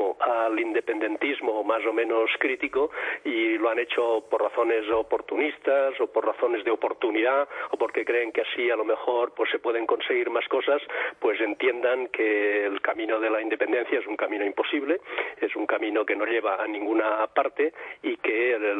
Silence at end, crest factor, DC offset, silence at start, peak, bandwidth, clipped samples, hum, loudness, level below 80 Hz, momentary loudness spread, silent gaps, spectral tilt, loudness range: 0 s; 18 dB; under 0.1%; 0 s; -8 dBFS; 8.4 kHz; under 0.1%; none; -26 LUFS; -70 dBFS; 4 LU; none; -4.5 dB/octave; 1 LU